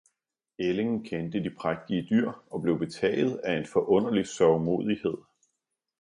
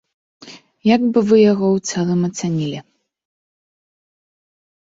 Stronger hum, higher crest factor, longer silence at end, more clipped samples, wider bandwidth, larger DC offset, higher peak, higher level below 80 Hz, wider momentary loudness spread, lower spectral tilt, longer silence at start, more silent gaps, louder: neither; about the same, 18 dB vs 18 dB; second, 0.8 s vs 2.05 s; neither; first, 11 kHz vs 7.8 kHz; neither; second, -10 dBFS vs -2 dBFS; about the same, -62 dBFS vs -60 dBFS; about the same, 8 LU vs 10 LU; about the same, -6.5 dB/octave vs -6 dB/octave; first, 0.6 s vs 0.45 s; neither; second, -28 LUFS vs -17 LUFS